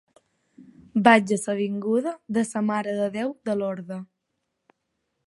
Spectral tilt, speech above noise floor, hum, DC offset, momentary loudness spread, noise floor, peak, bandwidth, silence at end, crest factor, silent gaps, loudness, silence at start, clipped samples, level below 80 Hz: -5.5 dB/octave; 55 dB; none; under 0.1%; 13 LU; -78 dBFS; -2 dBFS; 11.5 kHz; 1.25 s; 24 dB; none; -24 LUFS; 0.6 s; under 0.1%; -72 dBFS